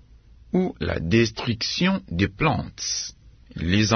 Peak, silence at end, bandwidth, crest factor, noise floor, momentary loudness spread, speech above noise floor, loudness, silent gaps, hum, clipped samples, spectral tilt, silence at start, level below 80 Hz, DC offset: -4 dBFS; 0 s; 6.6 kHz; 20 dB; -50 dBFS; 7 LU; 27 dB; -24 LUFS; none; none; under 0.1%; -4.5 dB/octave; 0.55 s; -46 dBFS; under 0.1%